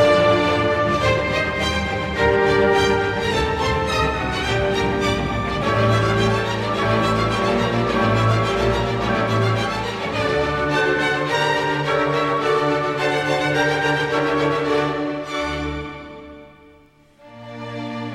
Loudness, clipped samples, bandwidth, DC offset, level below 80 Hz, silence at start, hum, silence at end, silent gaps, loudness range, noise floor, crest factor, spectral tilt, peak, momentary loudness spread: -19 LUFS; under 0.1%; 14 kHz; under 0.1%; -38 dBFS; 0 s; none; 0 s; none; 3 LU; -51 dBFS; 16 dB; -5.5 dB/octave; -4 dBFS; 7 LU